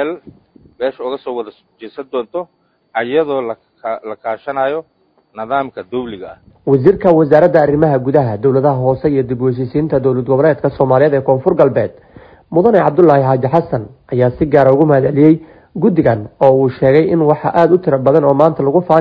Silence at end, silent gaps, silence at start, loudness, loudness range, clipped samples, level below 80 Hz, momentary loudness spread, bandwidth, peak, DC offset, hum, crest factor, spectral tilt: 0 s; none; 0 s; -13 LUFS; 9 LU; 0.3%; -46 dBFS; 14 LU; 5.2 kHz; 0 dBFS; under 0.1%; none; 14 dB; -10.5 dB/octave